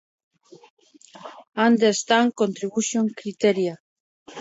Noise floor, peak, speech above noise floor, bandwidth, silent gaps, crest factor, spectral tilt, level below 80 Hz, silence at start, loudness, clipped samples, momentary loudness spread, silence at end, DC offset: -45 dBFS; -4 dBFS; 24 dB; 8 kHz; 3.80-4.26 s; 20 dB; -4 dB/octave; -74 dBFS; 1.2 s; -22 LUFS; under 0.1%; 23 LU; 0 s; under 0.1%